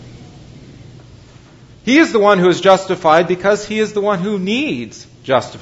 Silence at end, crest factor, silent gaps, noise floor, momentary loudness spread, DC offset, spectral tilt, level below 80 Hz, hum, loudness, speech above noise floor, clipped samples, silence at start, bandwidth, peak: 0 s; 16 dB; none; -42 dBFS; 11 LU; under 0.1%; -5 dB/octave; -50 dBFS; none; -14 LUFS; 28 dB; under 0.1%; 0 s; 8 kHz; 0 dBFS